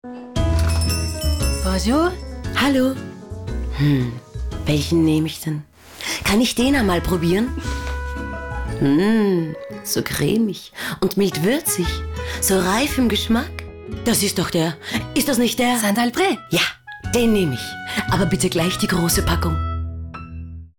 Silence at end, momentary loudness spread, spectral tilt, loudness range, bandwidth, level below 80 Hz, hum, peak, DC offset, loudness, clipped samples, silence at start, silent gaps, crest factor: 0.1 s; 11 LU; -4.5 dB/octave; 2 LU; 19.5 kHz; -32 dBFS; none; -8 dBFS; under 0.1%; -20 LUFS; under 0.1%; 0.05 s; none; 12 dB